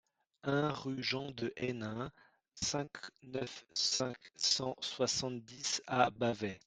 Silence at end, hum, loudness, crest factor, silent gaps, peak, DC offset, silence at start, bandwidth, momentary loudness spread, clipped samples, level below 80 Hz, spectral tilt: 0.1 s; none; -36 LUFS; 24 dB; none; -14 dBFS; under 0.1%; 0.45 s; 11 kHz; 11 LU; under 0.1%; -70 dBFS; -3 dB/octave